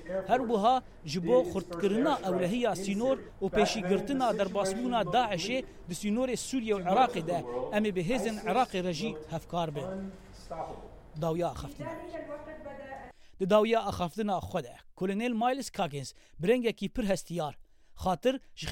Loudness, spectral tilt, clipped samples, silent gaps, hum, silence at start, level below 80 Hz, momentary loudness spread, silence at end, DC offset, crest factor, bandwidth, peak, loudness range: -31 LUFS; -5.5 dB/octave; under 0.1%; none; none; 0 s; -54 dBFS; 14 LU; 0 s; under 0.1%; 20 dB; 16.5 kHz; -10 dBFS; 7 LU